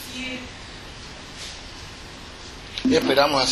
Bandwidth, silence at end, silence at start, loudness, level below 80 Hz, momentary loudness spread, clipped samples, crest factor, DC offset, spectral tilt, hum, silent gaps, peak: 13 kHz; 0 s; 0 s; -23 LUFS; -46 dBFS; 20 LU; under 0.1%; 22 dB; under 0.1%; -3.5 dB/octave; none; none; -4 dBFS